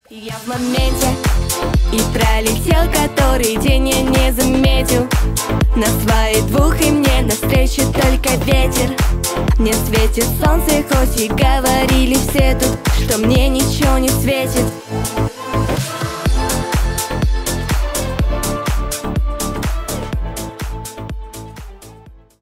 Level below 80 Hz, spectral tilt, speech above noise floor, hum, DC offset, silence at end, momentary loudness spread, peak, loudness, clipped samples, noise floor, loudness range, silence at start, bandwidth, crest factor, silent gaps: -18 dBFS; -4.5 dB/octave; 27 dB; none; under 0.1%; 0.25 s; 9 LU; 0 dBFS; -16 LUFS; under 0.1%; -41 dBFS; 6 LU; 0.1 s; 16.5 kHz; 14 dB; none